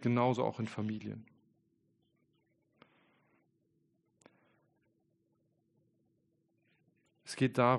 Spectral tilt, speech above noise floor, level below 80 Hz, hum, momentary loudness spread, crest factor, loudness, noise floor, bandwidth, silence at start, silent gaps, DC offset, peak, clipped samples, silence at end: -7 dB/octave; 45 dB; -78 dBFS; none; 18 LU; 26 dB; -35 LUFS; -77 dBFS; 10 kHz; 0 s; none; under 0.1%; -14 dBFS; under 0.1%; 0 s